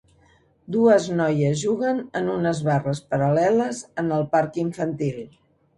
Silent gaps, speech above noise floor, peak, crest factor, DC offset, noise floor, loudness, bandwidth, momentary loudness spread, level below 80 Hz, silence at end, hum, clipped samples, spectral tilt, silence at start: none; 37 dB; -6 dBFS; 18 dB; under 0.1%; -58 dBFS; -22 LUFS; 11.5 kHz; 10 LU; -58 dBFS; 0.5 s; none; under 0.1%; -6.5 dB/octave; 0.7 s